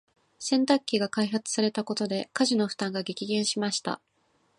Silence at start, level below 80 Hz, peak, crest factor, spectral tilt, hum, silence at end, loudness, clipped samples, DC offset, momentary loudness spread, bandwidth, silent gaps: 0.4 s; -76 dBFS; -8 dBFS; 20 dB; -3.5 dB/octave; none; 0.6 s; -28 LUFS; under 0.1%; under 0.1%; 7 LU; 11.5 kHz; none